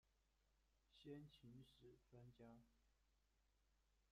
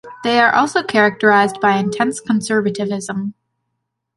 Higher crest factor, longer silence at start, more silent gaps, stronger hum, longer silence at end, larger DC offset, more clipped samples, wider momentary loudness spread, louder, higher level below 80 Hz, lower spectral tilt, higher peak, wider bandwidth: about the same, 20 dB vs 16 dB; about the same, 0.05 s vs 0.05 s; neither; neither; second, 0 s vs 0.85 s; neither; neither; about the same, 8 LU vs 10 LU; second, -65 LUFS vs -16 LUFS; second, -82 dBFS vs -62 dBFS; first, -6.5 dB/octave vs -4.5 dB/octave; second, -48 dBFS vs -2 dBFS; second, 9 kHz vs 11.5 kHz